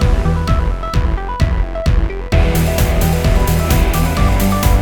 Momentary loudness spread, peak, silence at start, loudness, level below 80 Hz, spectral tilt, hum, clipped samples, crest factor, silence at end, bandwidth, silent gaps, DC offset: 4 LU; 0 dBFS; 0 s; -16 LUFS; -16 dBFS; -6 dB/octave; none; under 0.1%; 12 dB; 0 s; over 20 kHz; none; under 0.1%